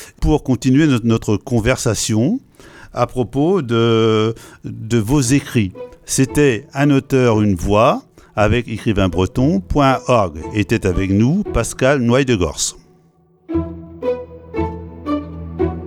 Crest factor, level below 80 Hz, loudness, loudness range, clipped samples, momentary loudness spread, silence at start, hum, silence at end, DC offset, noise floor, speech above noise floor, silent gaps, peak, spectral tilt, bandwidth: 16 dB; -32 dBFS; -17 LUFS; 3 LU; under 0.1%; 11 LU; 0 s; none; 0 s; under 0.1%; -53 dBFS; 38 dB; none; 0 dBFS; -5.5 dB/octave; 16.5 kHz